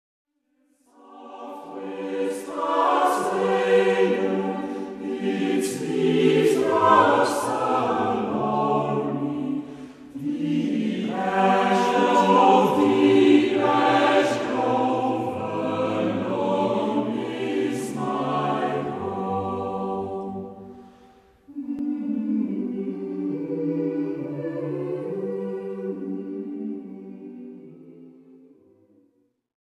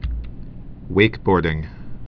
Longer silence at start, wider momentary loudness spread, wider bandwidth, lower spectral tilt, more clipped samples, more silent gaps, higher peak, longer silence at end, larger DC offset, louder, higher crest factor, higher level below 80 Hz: first, 1.1 s vs 0 s; second, 15 LU vs 22 LU; first, 14 kHz vs 5.4 kHz; second, -6 dB/octave vs -9 dB/octave; neither; neither; second, -4 dBFS vs 0 dBFS; first, 1.65 s vs 0.1 s; neither; second, -23 LUFS vs -20 LUFS; about the same, 20 dB vs 22 dB; second, -66 dBFS vs -32 dBFS